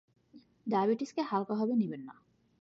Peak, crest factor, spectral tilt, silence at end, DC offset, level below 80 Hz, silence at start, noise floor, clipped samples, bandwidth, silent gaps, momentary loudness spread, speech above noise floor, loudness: -18 dBFS; 16 dB; -7.5 dB/octave; 0.5 s; under 0.1%; -82 dBFS; 0.35 s; -61 dBFS; under 0.1%; 7.8 kHz; none; 15 LU; 29 dB; -32 LUFS